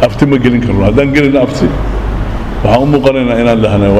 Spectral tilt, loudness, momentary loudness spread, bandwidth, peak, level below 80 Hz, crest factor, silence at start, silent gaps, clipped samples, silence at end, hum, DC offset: -7.5 dB/octave; -10 LUFS; 8 LU; 13 kHz; 0 dBFS; -20 dBFS; 10 dB; 0 s; none; 0.3%; 0 s; none; under 0.1%